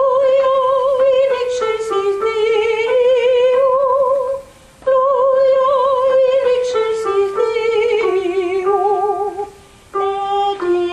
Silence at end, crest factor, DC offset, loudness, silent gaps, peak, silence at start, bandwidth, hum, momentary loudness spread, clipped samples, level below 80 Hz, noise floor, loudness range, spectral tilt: 0 s; 10 dB; under 0.1%; -15 LUFS; none; -4 dBFS; 0 s; 10.5 kHz; none; 6 LU; under 0.1%; -52 dBFS; -39 dBFS; 3 LU; -4 dB/octave